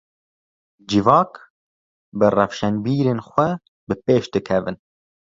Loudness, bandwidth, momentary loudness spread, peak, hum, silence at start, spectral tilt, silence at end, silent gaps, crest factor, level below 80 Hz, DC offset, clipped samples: -20 LUFS; 7.6 kHz; 14 LU; -2 dBFS; none; 0.9 s; -7 dB/octave; 0.65 s; 1.50-2.12 s, 3.68-3.87 s; 20 dB; -52 dBFS; under 0.1%; under 0.1%